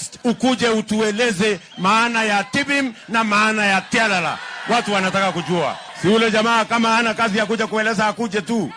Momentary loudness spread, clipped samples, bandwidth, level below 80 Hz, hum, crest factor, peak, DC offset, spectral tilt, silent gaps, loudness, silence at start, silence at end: 6 LU; under 0.1%; 10.5 kHz; -58 dBFS; none; 14 dB; -4 dBFS; under 0.1%; -4 dB/octave; none; -18 LUFS; 0 s; 0 s